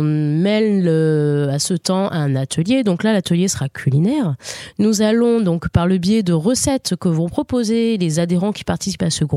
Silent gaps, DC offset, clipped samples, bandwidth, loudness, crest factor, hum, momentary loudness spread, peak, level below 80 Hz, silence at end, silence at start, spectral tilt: none; under 0.1%; under 0.1%; 14 kHz; -17 LUFS; 16 dB; none; 4 LU; -2 dBFS; -42 dBFS; 0 s; 0 s; -5.5 dB/octave